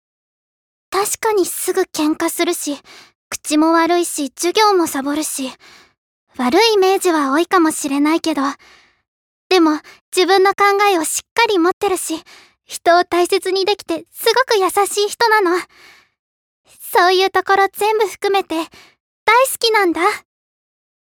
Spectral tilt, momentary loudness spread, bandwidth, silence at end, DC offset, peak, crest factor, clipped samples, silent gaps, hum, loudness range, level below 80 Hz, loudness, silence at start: -1.5 dB/octave; 11 LU; over 20 kHz; 1 s; under 0.1%; 0 dBFS; 16 dB; under 0.1%; 3.15-3.31 s, 5.98-6.27 s, 9.08-9.50 s, 10.01-10.12 s, 11.31-11.36 s, 11.73-11.81 s, 16.19-16.64 s, 19.00-19.26 s; none; 2 LU; -62 dBFS; -16 LUFS; 0.9 s